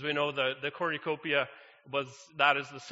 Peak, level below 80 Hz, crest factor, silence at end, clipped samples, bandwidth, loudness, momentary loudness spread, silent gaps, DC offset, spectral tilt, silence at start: -10 dBFS; -80 dBFS; 22 dB; 0 s; under 0.1%; 8 kHz; -31 LUFS; 9 LU; none; under 0.1%; -1 dB/octave; 0 s